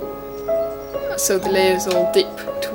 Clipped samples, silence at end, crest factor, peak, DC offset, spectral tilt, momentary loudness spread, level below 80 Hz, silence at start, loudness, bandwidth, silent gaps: under 0.1%; 0 s; 18 dB; -2 dBFS; under 0.1%; -3 dB/octave; 10 LU; -48 dBFS; 0 s; -20 LUFS; over 20 kHz; none